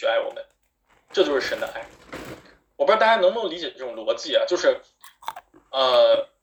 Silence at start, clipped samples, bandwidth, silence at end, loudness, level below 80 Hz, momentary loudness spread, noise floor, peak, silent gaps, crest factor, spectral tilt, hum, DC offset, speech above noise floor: 0 s; under 0.1%; over 20 kHz; 0.2 s; -22 LUFS; -62 dBFS; 20 LU; -64 dBFS; -4 dBFS; none; 18 dB; -2.5 dB/octave; none; under 0.1%; 43 dB